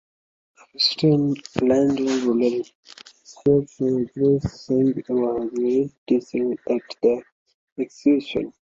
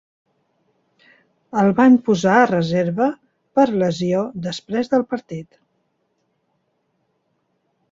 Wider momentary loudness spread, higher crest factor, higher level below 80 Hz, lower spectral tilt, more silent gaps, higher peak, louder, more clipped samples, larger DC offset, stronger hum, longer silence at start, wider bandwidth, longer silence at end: second, 9 LU vs 14 LU; about the same, 20 dB vs 18 dB; first, -54 dBFS vs -60 dBFS; about the same, -6.5 dB/octave vs -6.5 dB/octave; first, 2.75-2.83 s, 5.98-6.06 s, 7.32-7.46 s, 7.54-7.76 s vs none; about the same, -2 dBFS vs -2 dBFS; second, -22 LUFS vs -18 LUFS; neither; neither; neither; second, 0.8 s vs 1.55 s; about the same, 7.8 kHz vs 7.6 kHz; second, 0.25 s vs 2.5 s